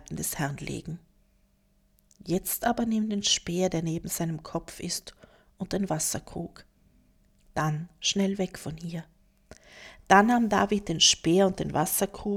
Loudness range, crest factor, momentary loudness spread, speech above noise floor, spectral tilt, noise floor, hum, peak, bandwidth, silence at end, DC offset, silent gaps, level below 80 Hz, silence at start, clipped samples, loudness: 9 LU; 24 dB; 19 LU; 39 dB; -3.5 dB/octave; -66 dBFS; none; -6 dBFS; 18.5 kHz; 0 s; under 0.1%; none; -54 dBFS; 0.1 s; under 0.1%; -27 LUFS